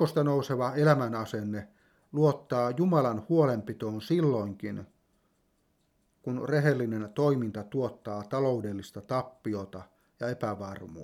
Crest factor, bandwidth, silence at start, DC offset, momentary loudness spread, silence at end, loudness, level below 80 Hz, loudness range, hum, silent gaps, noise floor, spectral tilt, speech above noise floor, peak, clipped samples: 20 dB; 15 kHz; 0 s; under 0.1%; 13 LU; 0 s; -30 LUFS; -70 dBFS; 5 LU; none; none; -72 dBFS; -8 dB/octave; 43 dB; -10 dBFS; under 0.1%